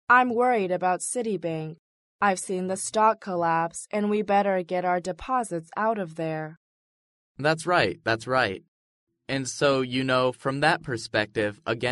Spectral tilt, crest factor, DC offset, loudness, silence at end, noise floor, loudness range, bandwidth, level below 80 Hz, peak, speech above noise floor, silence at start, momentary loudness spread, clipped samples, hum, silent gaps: -4.5 dB/octave; 20 dB; under 0.1%; -26 LUFS; 0 s; under -90 dBFS; 3 LU; 11.5 kHz; -62 dBFS; -6 dBFS; over 65 dB; 0.1 s; 8 LU; under 0.1%; none; 1.79-2.19 s, 6.57-7.35 s, 8.68-9.07 s